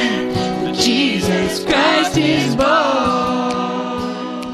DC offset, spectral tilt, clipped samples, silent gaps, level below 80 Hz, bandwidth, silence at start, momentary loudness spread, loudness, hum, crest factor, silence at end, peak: under 0.1%; -4.5 dB/octave; under 0.1%; none; -42 dBFS; 14 kHz; 0 s; 8 LU; -16 LUFS; none; 14 dB; 0 s; -2 dBFS